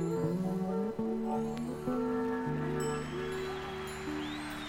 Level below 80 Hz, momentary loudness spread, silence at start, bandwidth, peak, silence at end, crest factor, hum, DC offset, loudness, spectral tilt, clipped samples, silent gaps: -56 dBFS; 5 LU; 0 s; 17 kHz; -22 dBFS; 0 s; 12 dB; none; under 0.1%; -35 LUFS; -6.5 dB/octave; under 0.1%; none